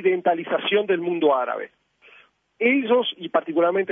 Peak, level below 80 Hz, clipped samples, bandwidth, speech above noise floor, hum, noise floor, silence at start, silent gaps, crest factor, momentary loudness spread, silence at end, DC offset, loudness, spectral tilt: -6 dBFS; -78 dBFS; under 0.1%; 3.8 kHz; 33 dB; none; -54 dBFS; 0 s; none; 16 dB; 6 LU; 0 s; under 0.1%; -22 LUFS; -8 dB/octave